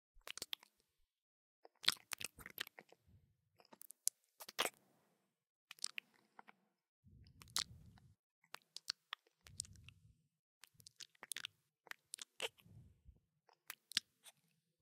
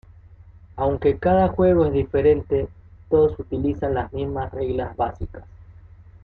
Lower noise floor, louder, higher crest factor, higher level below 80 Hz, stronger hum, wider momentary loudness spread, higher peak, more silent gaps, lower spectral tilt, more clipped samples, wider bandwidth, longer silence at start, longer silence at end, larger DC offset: first, -83 dBFS vs -46 dBFS; second, -46 LUFS vs -21 LUFS; first, 42 dB vs 16 dB; second, -78 dBFS vs -40 dBFS; neither; first, 23 LU vs 10 LU; second, -10 dBFS vs -6 dBFS; first, 1.22-1.63 s, 5.50-5.68 s, 6.88-7.03 s, 8.19-8.42 s, 10.39-10.61 s vs none; second, 0 dB/octave vs -11 dB/octave; neither; first, 16 kHz vs 4.7 kHz; second, 0.15 s vs 0.3 s; about the same, 0.5 s vs 0.5 s; neither